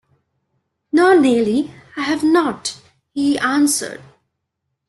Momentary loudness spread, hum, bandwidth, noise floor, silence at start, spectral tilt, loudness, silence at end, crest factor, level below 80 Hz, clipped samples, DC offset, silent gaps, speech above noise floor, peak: 15 LU; none; 12.5 kHz; -76 dBFS; 0.95 s; -3.5 dB/octave; -17 LUFS; 0.9 s; 16 dB; -60 dBFS; under 0.1%; under 0.1%; none; 60 dB; -2 dBFS